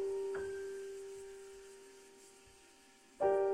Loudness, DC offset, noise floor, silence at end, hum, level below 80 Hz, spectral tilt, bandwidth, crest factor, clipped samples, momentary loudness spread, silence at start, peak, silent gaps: -41 LUFS; under 0.1%; -64 dBFS; 0 s; none; -74 dBFS; -4.5 dB/octave; 13 kHz; 18 dB; under 0.1%; 25 LU; 0 s; -22 dBFS; none